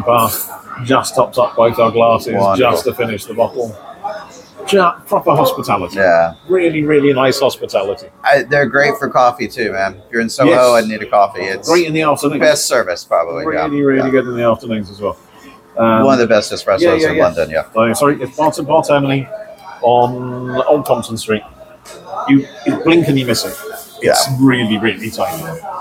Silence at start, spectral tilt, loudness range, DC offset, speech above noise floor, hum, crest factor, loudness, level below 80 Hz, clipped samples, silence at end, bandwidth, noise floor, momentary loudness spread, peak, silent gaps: 0 s; -5 dB/octave; 3 LU; under 0.1%; 27 dB; none; 14 dB; -14 LUFS; -50 dBFS; under 0.1%; 0 s; 17 kHz; -40 dBFS; 11 LU; 0 dBFS; none